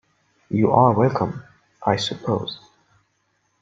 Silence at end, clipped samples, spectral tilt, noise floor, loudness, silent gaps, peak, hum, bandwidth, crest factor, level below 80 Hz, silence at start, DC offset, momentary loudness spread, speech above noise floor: 1.05 s; under 0.1%; -6.5 dB/octave; -69 dBFS; -21 LUFS; none; -2 dBFS; none; 7.8 kHz; 20 dB; -58 dBFS; 0.5 s; under 0.1%; 16 LU; 49 dB